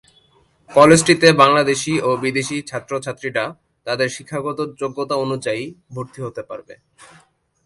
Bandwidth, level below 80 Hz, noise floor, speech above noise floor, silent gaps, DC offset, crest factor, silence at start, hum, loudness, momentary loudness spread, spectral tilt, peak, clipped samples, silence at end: 11.5 kHz; -56 dBFS; -57 dBFS; 39 dB; none; under 0.1%; 18 dB; 0.7 s; none; -17 LUFS; 20 LU; -4.5 dB/octave; 0 dBFS; under 0.1%; 0.9 s